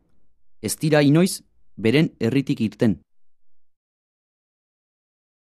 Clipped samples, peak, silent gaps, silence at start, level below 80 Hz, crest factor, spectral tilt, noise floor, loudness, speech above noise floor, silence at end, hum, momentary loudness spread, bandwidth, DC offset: under 0.1%; -4 dBFS; none; 0.65 s; -60 dBFS; 20 dB; -6 dB/octave; -49 dBFS; -21 LUFS; 29 dB; 1.85 s; none; 13 LU; 14 kHz; under 0.1%